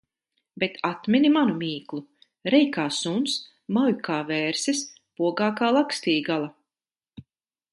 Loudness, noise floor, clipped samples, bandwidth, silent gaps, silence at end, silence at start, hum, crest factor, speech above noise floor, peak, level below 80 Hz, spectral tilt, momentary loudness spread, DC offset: -24 LUFS; under -90 dBFS; under 0.1%; 11.5 kHz; none; 0.5 s; 0.55 s; none; 18 dB; over 66 dB; -6 dBFS; -70 dBFS; -4 dB/octave; 10 LU; under 0.1%